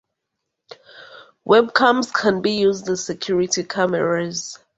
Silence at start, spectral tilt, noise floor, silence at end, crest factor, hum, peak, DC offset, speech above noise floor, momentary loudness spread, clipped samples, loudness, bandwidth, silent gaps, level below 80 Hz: 0.7 s; -3.5 dB/octave; -79 dBFS; 0.2 s; 20 dB; none; -2 dBFS; under 0.1%; 60 dB; 9 LU; under 0.1%; -19 LUFS; 8.2 kHz; none; -60 dBFS